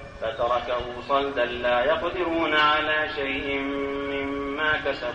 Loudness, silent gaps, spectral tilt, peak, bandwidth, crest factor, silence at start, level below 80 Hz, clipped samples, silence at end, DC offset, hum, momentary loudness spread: -25 LUFS; none; -5 dB/octave; -10 dBFS; 8.8 kHz; 16 dB; 0 s; -48 dBFS; under 0.1%; 0 s; under 0.1%; none; 8 LU